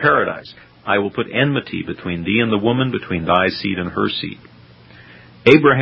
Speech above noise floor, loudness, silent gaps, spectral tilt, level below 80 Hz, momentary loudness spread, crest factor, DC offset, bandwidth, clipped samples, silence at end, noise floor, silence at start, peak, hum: 27 dB; -18 LUFS; none; -7.5 dB/octave; -46 dBFS; 12 LU; 18 dB; under 0.1%; 8 kHz; under 0.1%; 0 s; -44 dBFS; 0 s; 0 dBFS; none